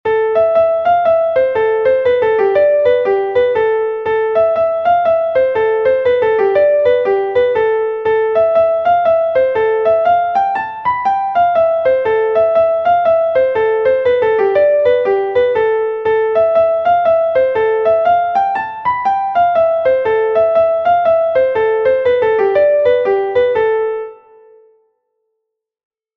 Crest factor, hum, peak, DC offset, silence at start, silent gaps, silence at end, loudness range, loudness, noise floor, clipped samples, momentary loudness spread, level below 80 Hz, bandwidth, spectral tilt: 12 dB; none; -2 dBFS; under 0.1%; 0.05 s; none; 2 s; 1 LU; -13 LUFS; -75 dBFS; under 0.1%; 3 LU; -50 dBFS; 5.8 kHz; -6.5 dB/octave